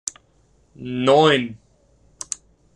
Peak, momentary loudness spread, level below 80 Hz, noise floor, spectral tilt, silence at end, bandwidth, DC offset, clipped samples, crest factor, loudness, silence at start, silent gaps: -4 dBFS; 20 LU; -58 dBFS; -59 dBFS; -4 dB/octave; 1.2 s; 12 kHz; under 0.1%; under 0.1%; 20 dB; -19 LUFS; 0.8 s; none